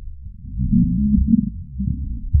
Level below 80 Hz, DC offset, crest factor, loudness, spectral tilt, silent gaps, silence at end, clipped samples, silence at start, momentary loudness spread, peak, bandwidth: -26 dBFS; under 0.1%; 16 dB; -20 LUFS; -20.5 dB/octave; none; 0 s; under 0.1%; 0 s; 16 LU; -4 dBFS; 0.4 kHz